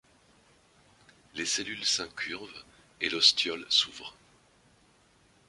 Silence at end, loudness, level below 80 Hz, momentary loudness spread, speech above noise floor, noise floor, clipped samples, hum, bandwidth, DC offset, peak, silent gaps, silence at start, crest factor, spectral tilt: 1.35 s; -27 LUFS; -70 dBFS; 23 LU; 34 dB; -64 dBFS; under 0.1%; none; 11.5 kHz; under 0.1%; -6 dBFS; none; 1.35 s; 28 dB; 0 dB/octave